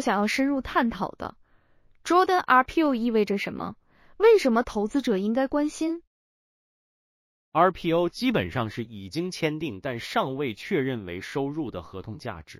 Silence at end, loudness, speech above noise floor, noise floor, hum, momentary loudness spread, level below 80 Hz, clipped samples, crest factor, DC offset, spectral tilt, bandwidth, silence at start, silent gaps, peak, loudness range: 0.05 s; -25 LUFS; 34 dB; -59 dBFS; none; 16 LU; -54 dBFS; under 0.1%; 20 dB; under 0.1%; -5.5 dB/octave; 15.5 kHz; 0 s; 6.07-7.52 s; -6 dBFS; 7 LU